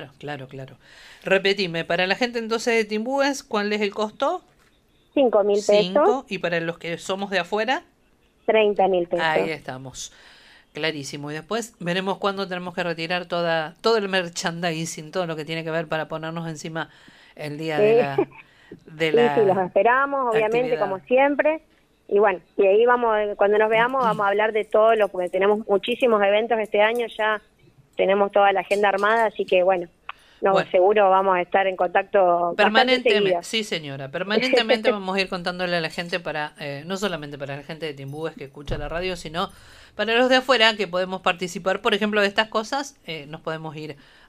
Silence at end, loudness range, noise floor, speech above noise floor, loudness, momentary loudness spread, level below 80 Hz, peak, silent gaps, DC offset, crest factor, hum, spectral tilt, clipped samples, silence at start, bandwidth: 0.35 s; 7 LU; -61 dBFS; 39 dB; -22 LUFS; 14 LU; -52 dBFS; 0 dBFS; none; under 0.1%; 22 dB; none; -4.5 dB/octave; under 0.1%; 0 s; 15 kHz